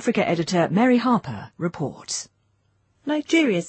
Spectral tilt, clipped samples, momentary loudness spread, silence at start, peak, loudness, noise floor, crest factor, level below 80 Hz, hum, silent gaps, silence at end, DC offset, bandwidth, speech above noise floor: -5 dB/octave; under 0.1%; 14 LU; 0 s; -8 dBFS; -22 LUFS; -66 dBFS; 16 dB; -62 dBFS; none; none; 0 s; under 0.1%; 8.8 kHz; 44 dB